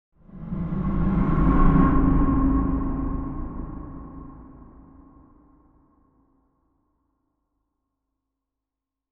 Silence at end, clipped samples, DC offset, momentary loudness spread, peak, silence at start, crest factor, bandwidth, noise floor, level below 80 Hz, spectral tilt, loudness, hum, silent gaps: 4.6 s; under 0.1%; under 0.1%; 21 LU; -4 dBFS; 0.35 s; 20 dB; 3.5 kHz; -87 dBFS; -28 dBFS; -12 dB/octave; -23 LUFS; none; none